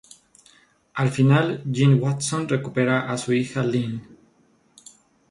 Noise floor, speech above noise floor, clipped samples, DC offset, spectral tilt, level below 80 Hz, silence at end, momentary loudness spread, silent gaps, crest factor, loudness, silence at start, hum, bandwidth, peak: -61 dBFS; 40 dB; under 0.1%; under 0.1%; -6 dB/octave; -60 dBFS; 1.3 s; 8 LU; none; 18 dB; -22 LUFS; 0.95 s; none; 11.5 kHz; -6 dBFS